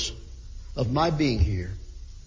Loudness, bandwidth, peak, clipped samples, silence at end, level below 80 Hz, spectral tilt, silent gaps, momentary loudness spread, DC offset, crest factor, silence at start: -26 LUFS; 7.6 kHz; -10 dBFS; under 0.1%; 0.05 s; -34 dBFS; -6 dB/octave; none; 21 LU; under 0.1%; 18 dB; 0 s